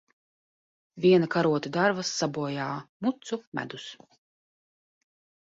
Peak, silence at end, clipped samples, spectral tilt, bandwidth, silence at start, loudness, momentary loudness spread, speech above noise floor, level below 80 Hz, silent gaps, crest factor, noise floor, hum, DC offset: -10 dBFS; 1.5 s; under 0.1%; -5 dB/octave; 7.8 kHz; 0.95 s; -27 LUFS; 14 LU; over 63 dB; -70 dBFS; 2.89-3.00 s, 3.47-3.52 s; 20 dB; under -90 dBFS; none; under 0.1%